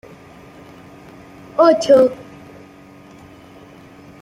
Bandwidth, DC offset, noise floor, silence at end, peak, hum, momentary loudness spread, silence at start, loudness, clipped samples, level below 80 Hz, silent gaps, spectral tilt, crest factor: 11.5 kHz; under 0.1%; -42 dBFS; 2.1 s; -2 dBFS; none; 25 LU; 1.6 s; -14 LUFS; under 0.1%; -58 dBFS; none; -5 dB/octave; 18 dB